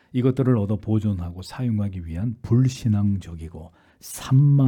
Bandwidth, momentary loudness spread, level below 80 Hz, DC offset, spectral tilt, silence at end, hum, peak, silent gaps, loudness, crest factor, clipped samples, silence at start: 17.5 kHz; 17 LU; -50 dBFS; under 0.1%; -8 dB/octave; 0 s; none; -8 dBFS; none; -23 LUFS; 14 dB; under 0.1%; 0.15 s